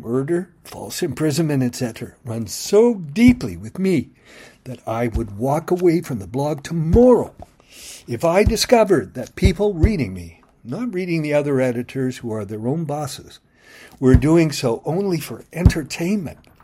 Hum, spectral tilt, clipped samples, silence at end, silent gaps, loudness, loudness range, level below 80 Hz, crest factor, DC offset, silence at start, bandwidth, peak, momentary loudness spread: none; -6.5 dB/octave; under 0.1%; 0.3 s; none; -19 LUFS; 5 LU; -32 dBFS; 20 dB; under 0.1%; 0 s; 16 kHz; 0 dBFS; 16 LU